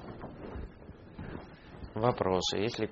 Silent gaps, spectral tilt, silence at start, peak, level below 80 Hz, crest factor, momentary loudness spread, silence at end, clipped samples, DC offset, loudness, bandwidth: none; -4.5 dB/octave; 0 s; -10 dBFS; -52 dBFS; 24 dB; 20 LU; 0 s; under 0.1%; under 0.1%; -33 LUFS; 7.4 kHz